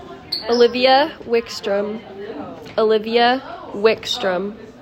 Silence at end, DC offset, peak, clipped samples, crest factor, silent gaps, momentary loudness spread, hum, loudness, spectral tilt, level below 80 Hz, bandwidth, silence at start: 0 s; under 0.1%; -2 dBFS; under 0.1%; 16 dB; none; 17 LU; none; -18 LUFS; -4 dB/octave; -56 dBFS; 15 kHz; 0 s